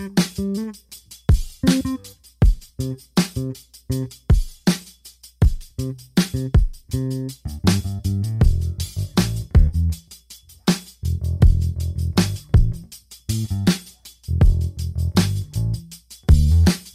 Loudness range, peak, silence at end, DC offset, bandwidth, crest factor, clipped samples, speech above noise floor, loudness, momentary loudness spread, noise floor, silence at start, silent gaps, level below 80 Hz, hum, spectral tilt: 2 LU; -2 dBFS; 0.05 s; under 0.1%; 15.5 kHz; 18 dB; under 0.1%; 25 dB; -22 LUFS; 13 LU; -47 dBFS; 0 s; none; -24 dBFS; none; -6 dB/octave